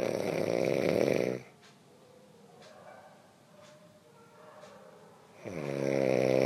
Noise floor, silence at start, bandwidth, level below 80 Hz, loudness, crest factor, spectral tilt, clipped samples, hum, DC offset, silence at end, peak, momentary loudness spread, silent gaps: -58 dBFS; 0 s; 14.5 kHz; -72 dBFS; -31 LUFS; 20 dB; -6 dB/octave; under 0.1%; none; under 0.1%; 0 s; -14 dBFS; 26 LU; none